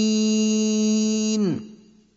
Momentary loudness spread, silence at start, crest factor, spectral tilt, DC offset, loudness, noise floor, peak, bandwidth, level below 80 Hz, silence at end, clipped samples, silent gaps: 5 LU; 0 s; 10 dB; -4.5 dB/octave; under 0.1%; -21 LUFS; -48 dBFS; -12 dBFS; 7.8 kHz; -66 dBFS; 0.4 s; under 0.1%; none